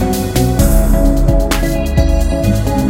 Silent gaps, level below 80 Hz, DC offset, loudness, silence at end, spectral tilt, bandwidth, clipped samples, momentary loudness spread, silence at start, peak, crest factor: none; -14 dBFS; under 0.1%; -14 LUFS; 0 s; -6 dB/octave; 16.5 kHz; under 0.1%; 3 LU; 0 s; 0 dBFS; 12 dB